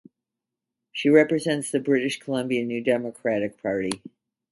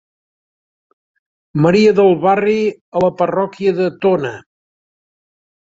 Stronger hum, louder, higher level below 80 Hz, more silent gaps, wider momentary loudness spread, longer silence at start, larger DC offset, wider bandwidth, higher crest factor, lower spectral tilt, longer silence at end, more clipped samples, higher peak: neither; second, -24 LUFS vs -15 LUFS; second, -66 dBFS vs -56 dBFS; second, none vs 2.81-2.92 s; about the same, 9 LU vs 9 LU; second, 0.95 s vs 1.55 s; neither; first, 11.5 kHz vs 7.8 kHz; about the same, 20 dB vs 16 dB; second, -5 dB/octave vs -7.5 dB/octave; second, 0.55 s vs 1.25 s; neither; about the same, -4 dBFS vs -2 dBFS